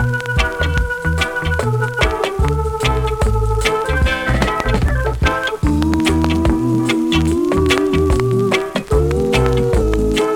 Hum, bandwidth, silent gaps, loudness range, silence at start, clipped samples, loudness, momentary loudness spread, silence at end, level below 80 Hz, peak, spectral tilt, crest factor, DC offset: none; 17.5 kHz; none; 2 LU; 0 s; under 0.1%; -16 LUFS; 3 LU; 0 s; -22 dBFS; 0 dBFS; -6 dB/octave; 16 dB; under 0.1%